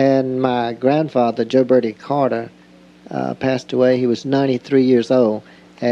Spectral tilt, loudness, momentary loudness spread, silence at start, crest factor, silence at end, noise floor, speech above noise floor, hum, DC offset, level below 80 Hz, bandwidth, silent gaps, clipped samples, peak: -7.5 dB/octave; -17 LUFS; 10 LU; 0 s; 16 dB; 0 s; -46 dBFS; 29 dB; none; under 0.1%; -62 dBFS; 7.8 kHz; none; under 0.1%; -2 dBFS